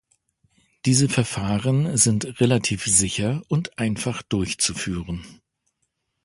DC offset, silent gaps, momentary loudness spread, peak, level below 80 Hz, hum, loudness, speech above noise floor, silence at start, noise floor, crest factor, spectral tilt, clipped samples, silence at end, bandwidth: under 0.1%; none; 10 LU; -4 dBFS; -46 dBFS; none; -22 LUFS; 53 dB; 0.85 s; -75 dBFS; 20 dB; -4 dB/octave; under 0.1%; 0.9 s; 11.5 kHz